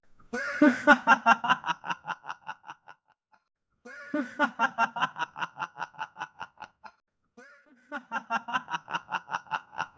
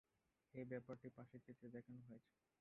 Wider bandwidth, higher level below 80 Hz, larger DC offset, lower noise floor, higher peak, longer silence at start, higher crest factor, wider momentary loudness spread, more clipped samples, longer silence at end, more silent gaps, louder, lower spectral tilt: first, 8 kHz vs 4 kHz; first, -70 dBFS vs -88 dBFS; neither; second, -68 dBFS vs -87 dBFS; first, -6 dBFS vs -38 dBFS; second, 0.35 s vs 0.55 s; about the same, 24 dB vs 22 dB; first, 22 LU vs 10 LU; neither; second, 0.1 s vs 0.4 s; neither; first, -28 LUFS vs -58 LUFS; second, -4 dB/octave vs -8.5 dB/octave